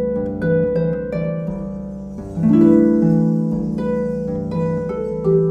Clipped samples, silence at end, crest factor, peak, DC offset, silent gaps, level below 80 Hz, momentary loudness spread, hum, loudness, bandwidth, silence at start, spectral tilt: under 0.1%; 0 s; 16 dB; -2 dBFS; under 0.1%; none; -40 dBFS; 14 LU; none; -18 LUFS; 5.4 kHz; 0 s; -10.5 dB/octave